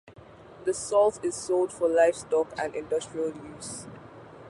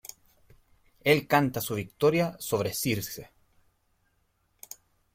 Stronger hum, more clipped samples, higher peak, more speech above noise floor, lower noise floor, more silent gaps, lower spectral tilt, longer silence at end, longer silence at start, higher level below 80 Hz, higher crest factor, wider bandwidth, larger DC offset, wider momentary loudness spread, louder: neither; neither; about the same, -10 dBFS vs -8 dBFS; second, 22 dB vs 45 dB; second, -48 dBFS vs -72 dBFS; neither; about the same, -4 dB/octave vs -4.5 dB/octave; second, 0 s vs 1.9 s; second, 0.05 s vs 1.05 s; about the same, -62 dBFS vs -62 dBFS; second, 18 dB vs 24 dB; second, 11.5 kHz vs 16.5 kHz; neither; second, 17 LU vs 22 LU; about the same, -27 LUFS vs -27 LUFS